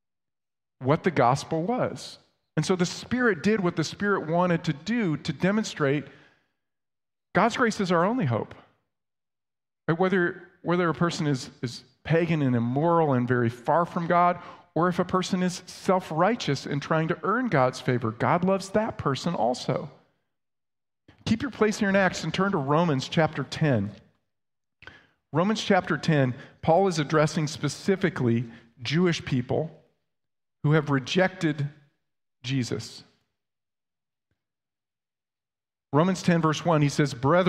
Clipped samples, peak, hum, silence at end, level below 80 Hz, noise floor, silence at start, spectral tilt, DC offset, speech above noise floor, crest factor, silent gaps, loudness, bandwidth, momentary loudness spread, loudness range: under 0.1%; -6 dBFS; none; 0 s; -60 dBFS; under -90 dBFS; 0.8 s; -6 dB/octave; under 0.1%; over 65 dB; 20 dB; none; -26 LUFS; 12.5 kHz; 8 LU; 4 LU